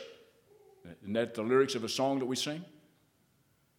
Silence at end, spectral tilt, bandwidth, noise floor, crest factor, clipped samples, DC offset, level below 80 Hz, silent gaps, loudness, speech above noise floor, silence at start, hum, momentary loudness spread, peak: 1.1 s; -4 dB/octave; 16.5 kHz; -71 dBFS; 20 dB; under 0.1%; under 0.1%; -80 dBFS; none; -32 LUFS; 39 dB; 0 s; none; 21 LU; -14 dBFS